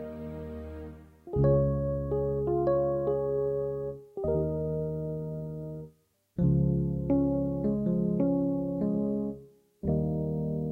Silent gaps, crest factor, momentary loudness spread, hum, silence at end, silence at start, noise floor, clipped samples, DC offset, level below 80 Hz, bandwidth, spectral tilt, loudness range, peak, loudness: none; 14 dB; 14 LU; none; 0 s; 0 s; -62 dBFS; under 0.1%; under 0.1%; -44 dBFS; 2.6 kHz; -12.5 dB/octave; 3 LU; -16 dBFS; -30 LUFS